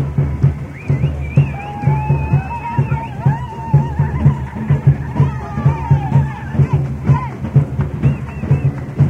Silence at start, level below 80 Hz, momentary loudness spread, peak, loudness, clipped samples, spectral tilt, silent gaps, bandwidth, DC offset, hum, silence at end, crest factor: 0 s; -28 dBFS; 5 LU; 0 dBFS; -17 LUFS; under 0.1%; -9.5 dB/octave; none; 3.5 kHz; under 0.1%; none; 0 s; 16 dB